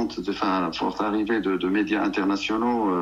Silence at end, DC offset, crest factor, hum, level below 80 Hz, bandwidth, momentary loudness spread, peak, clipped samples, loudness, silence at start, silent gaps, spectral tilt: 0 s; under 0.1%; 14 dB; none; -54 dBFS; 7.6 kHz; 3 LU; -10 dBFS; under 0.1%; -24 LUFS; 0 s; none; -5.5 dB/octave